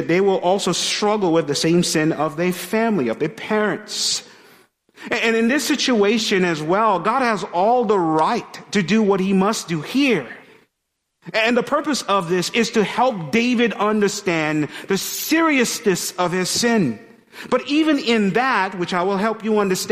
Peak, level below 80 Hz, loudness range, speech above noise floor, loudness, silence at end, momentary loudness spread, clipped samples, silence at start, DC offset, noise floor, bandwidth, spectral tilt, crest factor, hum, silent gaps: -4 dBFS; -60 dBFS; 3 LU; 57 dB; -19 LUFS; 0 s; 6 LU; under 0.1%; 0 s; under 0.1%; -75 dBFS; 15.5 kHz; -4 dB/octave; 16 dB; none; none